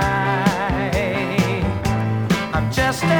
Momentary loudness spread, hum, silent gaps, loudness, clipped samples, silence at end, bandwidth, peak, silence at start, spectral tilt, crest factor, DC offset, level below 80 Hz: 3 LU; none; none; -20 LUFS; under 0.1%; 0 s; over 20 kHz; -4 dBFS; 0 s; -6 dB/octave; 16 dB; under 0.1%; -34 dBFS